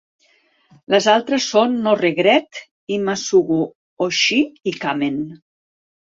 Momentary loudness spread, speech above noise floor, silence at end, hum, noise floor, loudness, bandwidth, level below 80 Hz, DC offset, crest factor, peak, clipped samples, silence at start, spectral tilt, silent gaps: 11 LU; 42 dB; 0.75 s; none; -59 dBFS; -18 LUFS; 7.8 kHz; -64 dBFS; under 0.1%; 18 dB; -2 dBFS; under 0.1%; 0.9 s; -3.5 dB/octave; 2.71-2.87 s, 3.75-3.97 s